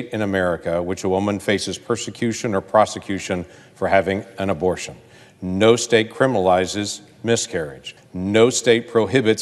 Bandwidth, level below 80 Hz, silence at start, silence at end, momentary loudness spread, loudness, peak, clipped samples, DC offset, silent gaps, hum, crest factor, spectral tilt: 12.5 kHz; -54 dBFS; 0 s; 0 s; 11 LU; -20 LUFS; 0 dBFS; under 0.1%; under 0.1%; none; none; 20 dB; -4.5 dB/octave